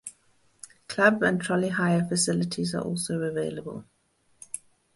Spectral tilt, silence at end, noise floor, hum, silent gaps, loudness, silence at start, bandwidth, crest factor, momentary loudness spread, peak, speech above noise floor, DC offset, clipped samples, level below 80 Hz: -4.5 dB/octave; 0.4 s; -68 dBFS; none; none; -26 LUFS; 0.05 s; 12 kHz; 22 dB; 21 LU; -6 dBFS; 42 dB; under 0.1%; under 0.1%; -64 dBFS